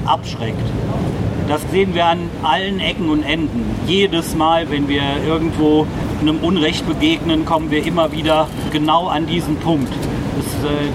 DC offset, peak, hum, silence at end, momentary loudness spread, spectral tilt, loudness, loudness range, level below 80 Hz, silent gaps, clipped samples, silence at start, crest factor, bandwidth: under 0.1%; -2 dBFS; none; 0 s; 6 LU; -6 dB/octave; -17 LUFS; 2 LU; -34 dBFS; none; under 0.1%; 0 s; 16 dB; 15.5 kHz